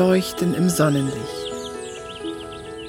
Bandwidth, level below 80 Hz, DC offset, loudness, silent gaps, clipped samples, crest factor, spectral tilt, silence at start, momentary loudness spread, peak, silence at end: 16.5 kHz; -50 dBFS; under 0.1%; -23 LUFS; none; under 0.1%; 16 dB; -5.5 dB/octave; 0 s; 14 LU; -6 dBFS; 0 s